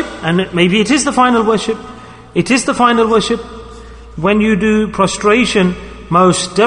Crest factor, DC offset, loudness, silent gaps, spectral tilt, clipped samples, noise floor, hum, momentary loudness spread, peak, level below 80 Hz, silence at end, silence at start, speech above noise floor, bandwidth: 14 dB; under 0.1%; -13 LUFS; none; -4.5 dB/octave; under 0.1%; -33 dBFS; none; 10 LU; 0 dBFS; -38 dBFS; 0 s; 0 s; 21 dB; 11 kHz